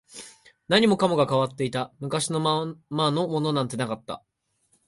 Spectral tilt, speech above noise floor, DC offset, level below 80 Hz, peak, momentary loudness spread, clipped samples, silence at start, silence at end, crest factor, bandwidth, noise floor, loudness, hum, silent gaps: -5 dB/octave; 44 dB; under 0.1%; -64 dBFS; -6 dBFS; 14 LU; under 0.1%; 0.15 s; 0.7 s; 20 dB; 11.5 kHz; -69 dBFS; -25 LUFS; none; none